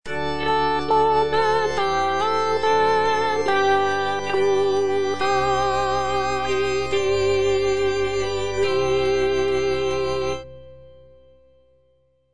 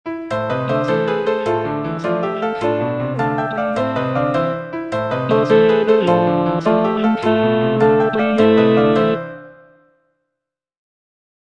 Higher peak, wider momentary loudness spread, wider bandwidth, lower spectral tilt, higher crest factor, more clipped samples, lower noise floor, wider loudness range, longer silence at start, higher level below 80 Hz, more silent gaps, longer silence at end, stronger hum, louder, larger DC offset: second, -10 dBFS vs 0 dBFS; second, 4 LU vs 9 LU; first, 10 kHz vs 9 kHz; second, -4.5 dB/octave vs -8 dB/octave; about the same, 12 dB vs 16 dB; neither; second, -63 dBFS vs -81 dBFS; about the same, 4 LU vs 5 LU; about the same, 0 s vs 0.05 s; first, -44 dBFS vs -52 dBFS; neither; second, 0 s vs 2 s; neither; second, -21 LUFS vs -17 LUFS; first, 2% vs under 0.1%